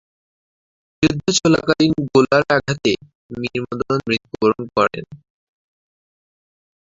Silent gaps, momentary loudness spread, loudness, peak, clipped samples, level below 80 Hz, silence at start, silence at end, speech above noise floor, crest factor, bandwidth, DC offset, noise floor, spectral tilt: 3.15-3.29 s; 10 LU; -18 LUFS; 0 dBFS; under 0.1%; -50 dBFS; 1 s; 1.65 s; over 72 dB; 20 dB; 8 kHz; under 0.1%; under -90 dBFS; -4.5 dB/octave